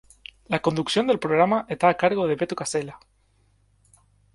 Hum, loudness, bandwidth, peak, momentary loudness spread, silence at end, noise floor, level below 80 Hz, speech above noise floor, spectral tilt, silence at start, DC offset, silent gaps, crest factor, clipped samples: none; -23 LUFS; 11.5 kHz; -4 dBFS; 11 LU; 1.4 s; -63 dBFS; -60 dBFS; 41 dB; -5 dB/octave; 0.5 s; under 0.1%; none; 20 dB; under 0.1%